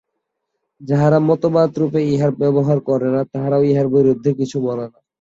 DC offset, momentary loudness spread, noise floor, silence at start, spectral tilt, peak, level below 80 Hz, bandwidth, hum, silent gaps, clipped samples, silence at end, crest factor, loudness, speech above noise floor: under 0.1%; 7 LU; -76 dBFS; 0.8 s; -9 dB/octave; -2 dBFS; -56 dBFS; 7.8 kHz; none; none; under 0.1%; 0.3 s; 14 dB; -17 LUFS; 60 dB